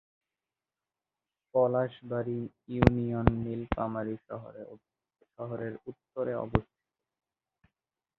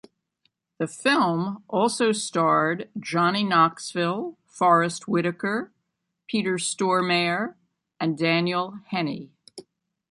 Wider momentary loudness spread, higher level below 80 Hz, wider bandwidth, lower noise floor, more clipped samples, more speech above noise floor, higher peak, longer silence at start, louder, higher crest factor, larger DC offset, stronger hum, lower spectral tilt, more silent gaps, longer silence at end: first, 17 LU vs 11 LU; first, -46 dBFS vs -72 dBFS; second, 6.4 kHz vs 11.5 kHz; first, under -90 dBFS vs -79 dBFS; neither; first, over 59 dB vs 55 dB; first, 0 dBFS vs -6 dBFS; first, 1.55 s vs 0.8 s; second, -31 LUFS vs -24 LUFS; first, 32 dB vs 20 dB; neither; neither; first, -8 dB/octave vs -4.5 dB/octave; neither; first, 1.55 s vs 0.5 s